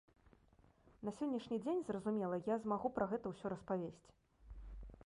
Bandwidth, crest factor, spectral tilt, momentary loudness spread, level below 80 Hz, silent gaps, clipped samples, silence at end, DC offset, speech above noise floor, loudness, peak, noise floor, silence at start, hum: 11 kHz; 18 dB; -7.5 dB/octave; 17 LU; -62 dBFS; none; under 0.1%; 0 s; under 0.1%; 29 dB; -42 LUFS; -24 dBFS; -70 dBFS; 1 s; none